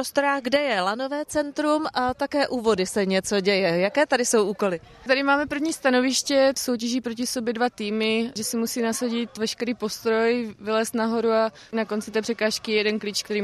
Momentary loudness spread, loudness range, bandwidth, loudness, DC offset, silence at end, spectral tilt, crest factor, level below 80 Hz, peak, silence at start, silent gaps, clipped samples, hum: 7 LU; 3 LU; 15 kHz; -24 LUFS; under 0.1%; 0 s; -3.5 dB/octave; 16 dB; -60 dBFS; -8 dBFS; 0 s; none; under 0.1%; none